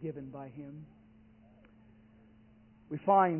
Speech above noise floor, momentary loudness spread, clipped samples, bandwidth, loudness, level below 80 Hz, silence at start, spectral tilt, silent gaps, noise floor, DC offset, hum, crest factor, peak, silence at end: 29 dB; 24 LU; under 0.1%; 3.1 kHz; -34 LUFS; -70 dBFS; 0 s; -3 dB/octave; none; -61 dBFS; under 0.1%; none; 22 dB; -14 dBFS; 0 s